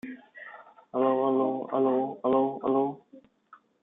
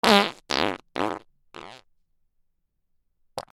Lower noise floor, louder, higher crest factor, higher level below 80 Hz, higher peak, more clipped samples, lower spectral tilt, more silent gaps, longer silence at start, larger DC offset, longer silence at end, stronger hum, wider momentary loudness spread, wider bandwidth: second, -58 dBFS vs -71 dBFS; about the same, -27 LUFS vs -25 LUFS; second, 16 dB vs 28 dB; second, -76 dBFS vs -60 dBFS; second, -12 dBFS vs 0 dBFS; neither; first, -10 dB/octave vs -3.5 dB/octave; neither; about the same, 0.05 s vs 0.05 s; neither; first, 0.65 s vs 0.15 s; neither; second, 20 LU vs 24 LU; second, 3.8 kHz vs 19.5 kHz